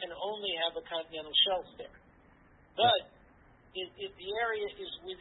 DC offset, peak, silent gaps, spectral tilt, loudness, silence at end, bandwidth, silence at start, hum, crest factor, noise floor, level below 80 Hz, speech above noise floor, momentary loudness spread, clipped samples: under 0.1%; -14 dBFS; none; -6.5 dB/octave; -32 LUFS; 0.05 s; 4.1 kHz; 0 s; none; 20 dB; -61 dBFS; -66 dBFS; 28 dB; 17 LU; under 0.1%